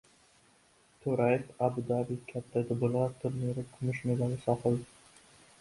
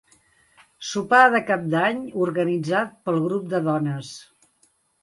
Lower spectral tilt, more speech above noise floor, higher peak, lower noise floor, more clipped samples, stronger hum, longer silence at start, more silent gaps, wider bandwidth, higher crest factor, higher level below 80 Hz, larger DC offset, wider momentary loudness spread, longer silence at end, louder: first, -8.5 dB/octave vs -5.5 dB/octave; second, 34 dB vs 43 dB; second, -14 dBFS vs -2 dBFS; about the same, -65 dBFS vs -64 dBFS; neither; neither; first, 1.05 s vs 0.8 s; neither; about the same, 11.5 kHz vs 11.5 kHz; about the same, 20 dB vs 22 dB; first, -64 dBFS vs -70 dBFS; neither; second, 6 LU vs 15 LU; about the same, 0.75 s vs 0.8 s; second, -33 LUFS vs -22 LUFS